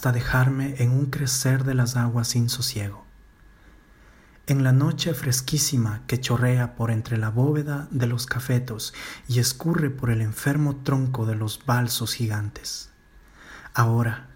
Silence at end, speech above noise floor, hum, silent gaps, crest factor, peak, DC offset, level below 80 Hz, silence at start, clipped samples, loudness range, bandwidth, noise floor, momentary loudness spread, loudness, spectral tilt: 0 s; 29 dB; none; none; 18 dB; -4 dBFS; under 0.1%; -48 dBFS; 0 s; under 0.1%; 3 LU; 16.5 kHz; -52 dBFS; 9 LU; -24 LUFS; -5 dB/octave